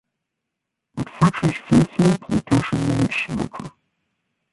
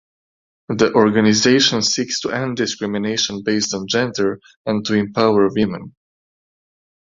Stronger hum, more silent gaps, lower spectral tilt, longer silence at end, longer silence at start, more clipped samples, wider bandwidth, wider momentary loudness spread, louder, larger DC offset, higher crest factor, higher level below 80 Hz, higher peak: neither; second, none vs 4.57-4.65 s; first, -6.5 dB/octave vs -4 dB/octave; second, 0.85 s vs 1.2 s; first, 0.95 s vs 0.7 s; neither; first, 11.5 kHz vs 7.8 kHz; first, 14 LU vs 9 LU; second, -20 LUFS vs -17 LUFS; neither; about the same, 18 dB vs 18 dB; first, -46 dBFS vs -54 dBFS; about the same, -2 dBFS vs -2 dBFS